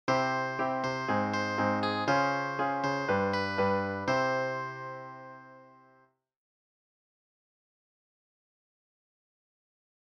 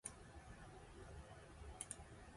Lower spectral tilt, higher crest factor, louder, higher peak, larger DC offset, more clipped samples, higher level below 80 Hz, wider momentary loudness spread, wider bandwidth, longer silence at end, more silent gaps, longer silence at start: first, -5.5 dB/octave vs -3.5 dB/octave; second, 18 dB vs 28 dB; first, -30 LUFS vs -56 LUFS; first, -14 dBFS vs -30 dBFS; neither; neither; second, -72 dBFS vs -62 dBFS; first, 14 LU vs 8 LU; second, 9.6 kHz vs 11.5 kHz; first, 4.4 s vs 0 s; neither; about the same, 0.05 s vs 0.05 s